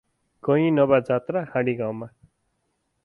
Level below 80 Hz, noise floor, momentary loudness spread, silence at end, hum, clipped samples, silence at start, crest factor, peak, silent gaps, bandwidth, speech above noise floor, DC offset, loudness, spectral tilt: -62 dBFS; -74 dBFS; 13 LU; 0.95 s; none; under 0.1%; 0.45 s; 18 dB; -6 dBFS; none; 5 kHz; 52 dB; under 0.1%; -23 LUFS; -9.5 dB/octave